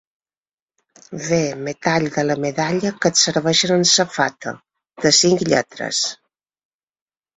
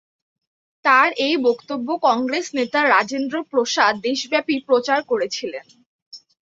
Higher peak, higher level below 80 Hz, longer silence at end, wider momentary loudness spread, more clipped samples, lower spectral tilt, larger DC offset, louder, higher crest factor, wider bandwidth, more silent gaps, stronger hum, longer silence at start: about the same, -2 dBFS vs -2 dBFS; first, -58 dBFS vs -70 dBFS; first, 1.2 s vs 0.3 s; about the same, 10 LU vs 10 LU; neither; about the same, -3 dB/octave vs -2.5 dB/octave; neither; about the same, -17 LUFS vs -19 LUFS; about the same, 20 dB vs 18 dB; about the same, 8.4 kHz vs 7.8 kHz; second, none vs 5.86-6.11 s; neither; first, 1.1 s vs 0.85 s